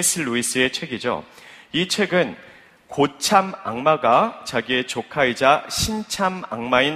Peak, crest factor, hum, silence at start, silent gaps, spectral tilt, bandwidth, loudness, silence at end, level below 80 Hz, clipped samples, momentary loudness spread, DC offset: 0 dBFS; 20 dB; none; 0 s; none; -3 dB/octave; 15.5 kHz; -21 LUFS; 0 s; -50 dBFS; under 0.1%; 10 LU; under 0.1%